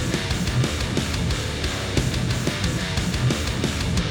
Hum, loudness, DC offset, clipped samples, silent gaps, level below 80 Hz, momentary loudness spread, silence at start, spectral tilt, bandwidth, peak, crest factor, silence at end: none; -24 LUFS; under 0.1%; under 0.1%; none; -32 dBFS; 2 LU; 0 s; -4.5 dB/octave; over 20 kHz; -8 dBFS; 16 dB; 0 s